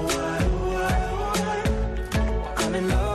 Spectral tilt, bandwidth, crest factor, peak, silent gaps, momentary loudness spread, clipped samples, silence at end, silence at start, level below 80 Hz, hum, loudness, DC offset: -5 dB/octave; 13.5 kHz; 10 dB; -14 dBFS; none; 2 LU; under 0.1%; 0 s; 0 s; -28 dBFS; none; -25 LUFS; under 0.1%